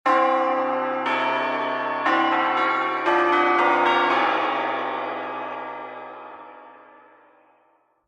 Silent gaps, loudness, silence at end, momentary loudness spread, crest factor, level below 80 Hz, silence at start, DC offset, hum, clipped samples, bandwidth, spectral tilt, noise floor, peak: none; -22 LUFS; 1.3 s; 16 LU; 16 dB; -80 dBFS; 0.05 s; under 0.1%; none; under 0.1%; 9 kHz; -4 dB/octave; -63 dBFS; -6 dBFS